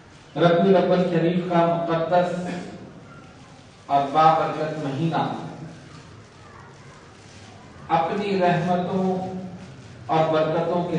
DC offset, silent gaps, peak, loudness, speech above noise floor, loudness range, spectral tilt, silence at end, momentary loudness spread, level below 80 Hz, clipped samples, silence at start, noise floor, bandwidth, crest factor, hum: under 0.1%; none; -4 dBFS; -22 LUFS; 25 dB; 8 LU; -7.5 dB/octave; 0 s; 22 LU; -62 dBFS; under 0.1%; 0.35 s; -46 dBFS; 9.8 kHz; 20 dB; none